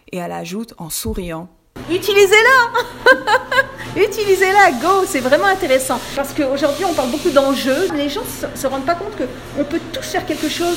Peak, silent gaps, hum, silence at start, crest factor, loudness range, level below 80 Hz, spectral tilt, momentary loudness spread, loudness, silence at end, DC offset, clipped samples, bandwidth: 0 dBFS; none; none; 0.1 s; 16 dB; 6 LU; -42 dBFS; -3 dB/octave; 14 LU; -16 LUFS; 0 s; under 0.1%; under 0.1%; 16.5 kHz